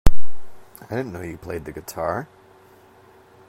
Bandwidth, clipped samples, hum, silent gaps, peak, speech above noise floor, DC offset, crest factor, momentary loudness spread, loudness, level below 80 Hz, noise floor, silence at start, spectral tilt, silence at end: 15 kHz; 0.3%; none; none; 0 dBFS; 25 dB; under 0.1%; 16 dB; 24 LU; -30 LUFS; -30 dBFS; -51 dBFS; 0.05 s; -6 dB/octave; 0 s